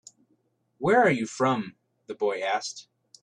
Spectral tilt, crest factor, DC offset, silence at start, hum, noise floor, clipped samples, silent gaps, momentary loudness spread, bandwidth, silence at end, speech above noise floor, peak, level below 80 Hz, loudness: -5 dB/octave; 20 dB; under 0.1%; 0.8 s; none; -71 dBFS; under 0.1%; none; 19 LU; 10.5 kHz; 0.4 s; 45 dB; -8 dBFS; -72 dBFS; -26 LUFS